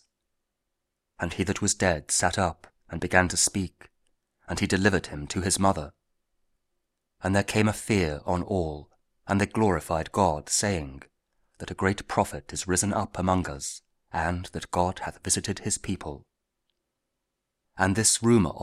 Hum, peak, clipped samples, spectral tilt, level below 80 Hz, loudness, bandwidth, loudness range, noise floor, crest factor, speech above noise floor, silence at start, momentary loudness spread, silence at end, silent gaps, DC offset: none; -2 dBFS; under 0.1%; -4 dB/octave; -48 dBFS; -26 LUFS; 15.5 kHz; 4 LU; -82 dBFS; 26 dB; 56 dB; 1.2 s; 13 LU; 0 s; none; under 0.1%